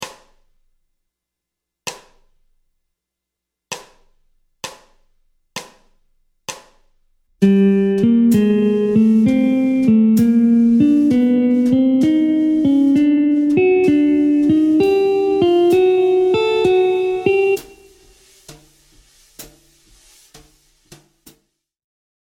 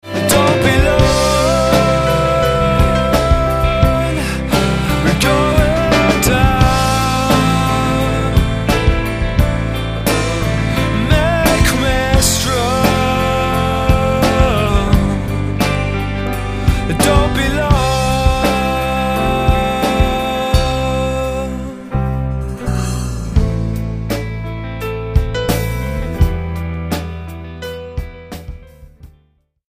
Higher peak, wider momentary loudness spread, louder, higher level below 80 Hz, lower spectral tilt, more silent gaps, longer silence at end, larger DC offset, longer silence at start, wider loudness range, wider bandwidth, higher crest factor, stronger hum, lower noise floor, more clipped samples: about the same, -2 dBFS vs 0 dBFS; first, 19 LU vs 10 LU; about the same, -14 LUFS vs -15 LUFS; second, -54 dBFS vs -20 dBFS; first, -7 dB/octave vs -5 dB/octave; neither; first, 2.75 s vs 0.6 s; neither; about the same, 0 s vs 0.05 s; first, 22 LU vs 7 LU; about the same, 16.5 kHz vs 15.5 kHz; about the same, 16 dB vs 14 dB; neither; first, -82 dBFS vs -57 dBFS; neither